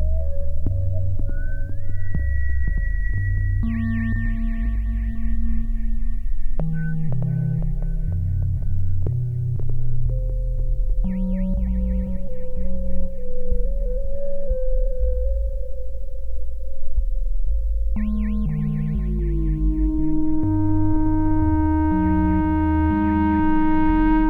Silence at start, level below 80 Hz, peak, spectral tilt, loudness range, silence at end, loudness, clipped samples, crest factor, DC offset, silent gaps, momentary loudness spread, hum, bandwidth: 0 s; -22 dBFS; -8 dBFS; -11 dB/octave; 8 LU; 0 s; -24 LUFS; under 0.1%; 12 dB; under 0.1%; none; 11 LU; none; 3 kHz